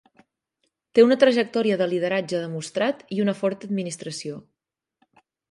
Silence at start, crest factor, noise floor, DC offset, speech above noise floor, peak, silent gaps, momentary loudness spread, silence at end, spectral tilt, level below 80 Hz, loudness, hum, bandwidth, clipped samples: 0.95 s; 20 dB; -84 dBFS; under 0.1%; 62 dB; -4 dBFS; none; 15 LU; 1.1 s; -5.5 dB/octave; -72 dBFS; -23 LUFS; none; 11.5 kHz; under 0.1%